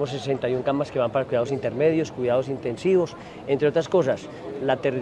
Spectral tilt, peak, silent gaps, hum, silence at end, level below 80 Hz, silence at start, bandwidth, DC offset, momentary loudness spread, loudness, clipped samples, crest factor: -6.5 dB/octave; -8 dBFS; none; none; 0 s; -58 dBFS; 0 s; 10 kHz; under 0.1%; 7 LU; -24 LUFS; under 0.1%; 16 dB